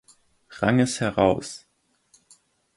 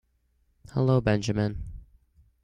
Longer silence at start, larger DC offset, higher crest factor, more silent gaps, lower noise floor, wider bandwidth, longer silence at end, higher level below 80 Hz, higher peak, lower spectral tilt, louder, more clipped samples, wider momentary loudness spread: second, 0.5 s vs 0.75 s; neither; about the same, 22 dB vs 20 dB; neither; second, -63 dBFS vs -69 dBFS; first, 11.5 kHz vs 9.4 kHz; first, 1.2 s vs 0.6 s; second, -52 dBFS vs -46 dBFS; first, -4 dBFS vs -8 dBFS; second, -5.5 dB/octave vs -7 dB/octave; first, -23 LUFS vs -26 LUFS; neither; about the same, 15 LU vs 16 LU